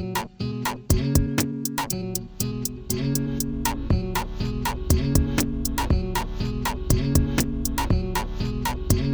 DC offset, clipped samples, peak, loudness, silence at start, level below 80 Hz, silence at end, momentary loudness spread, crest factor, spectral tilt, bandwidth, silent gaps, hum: under 0.1%; under 0.1%; -4 dBFS; -25 LUFS; 0 s; -30 dBFS; 0 s; 7 LU; 20 dB; -5 dB/octave; over 20 kHz; none; none